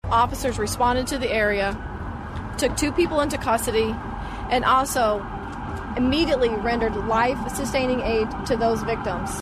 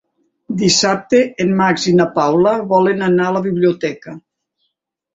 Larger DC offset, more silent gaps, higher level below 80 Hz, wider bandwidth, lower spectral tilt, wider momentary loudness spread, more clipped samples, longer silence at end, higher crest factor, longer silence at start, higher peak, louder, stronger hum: neither; neither; first, -36 dBFS vs -56 dBFS; first, 15 kHz vs 8 kHz; about the same, -4.5 dB/octave vs -4.5 dB/octave; about the same, 11 LU vs 9 LU; neither; second, 0 s vs 0.95 s; about the same, 14 dB vs 14 dB; second, 0.05 s vs 0.5 s; second, -8 dBFS vs -2 dBFS; second, -23 LUFS vs -15 LUFS; neither